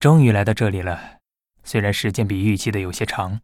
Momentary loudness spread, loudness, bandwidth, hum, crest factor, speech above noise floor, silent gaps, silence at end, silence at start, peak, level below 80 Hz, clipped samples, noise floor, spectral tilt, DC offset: 11 LU; -20 LUFS; 15.5 kHz; none; 18 dB; 40 dB; none; 0.05 s; 0 s; -2 dBFS; -46 dBFS; under 0.1%; -58 dBFS; -6.5 dB/octave; under 0.1%